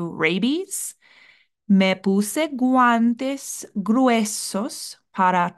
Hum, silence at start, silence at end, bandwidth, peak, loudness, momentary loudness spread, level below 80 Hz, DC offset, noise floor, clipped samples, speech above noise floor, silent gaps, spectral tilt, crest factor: none; 0 s; 0.05 s; 12.5 kHz; -6 dBFS; -21 LUFS; 12 LU; -70 dBFS; under 0.1%; -55 dBFS; under 0.1%; 35 dB; none; -4.5 dB/octave; 16 dB